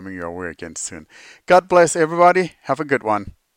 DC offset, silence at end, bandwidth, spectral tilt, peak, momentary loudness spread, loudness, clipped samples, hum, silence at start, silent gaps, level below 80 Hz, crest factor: under 0.1%; 0.25 s; 15 kHz; -4.5 dB/octave; -2 dBFS; 16 LU; -17 LUFS; under 0.1%; none; 0 s; none; -54 dBFS; 18 dB